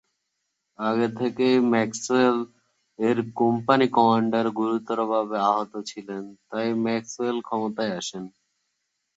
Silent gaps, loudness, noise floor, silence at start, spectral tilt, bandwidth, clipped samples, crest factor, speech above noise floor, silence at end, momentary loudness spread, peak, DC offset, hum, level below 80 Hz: none; -24 LUFS; -78 dBFS; 0.8 s; -5 dB/octave; 8.2 kHz; under 0.1%; 22 dB; 55 dB; 0.9 s; 14 LU; -4 dBFS; under 0.1%; none; -70 dBFS